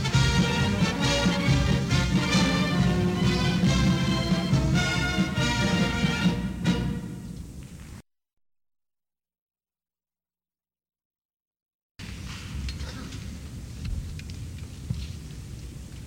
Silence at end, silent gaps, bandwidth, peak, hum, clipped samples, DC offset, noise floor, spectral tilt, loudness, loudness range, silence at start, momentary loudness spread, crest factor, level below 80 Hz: 0 s; 9.38-9.47 s, 11.05-11.11 s, 11.18-11.29 s, 11.36-11.51 s, 11.62-11.66 s, 11.74-11.95 s; 16.5 kHz; -10 dBFS; none; under 0.1%; under 0.1%; under -90 dBFS; -5 dB/octave; -25 LUFS; 17 LU; 0 s; 18 LU; 18 dB; -38 dBFS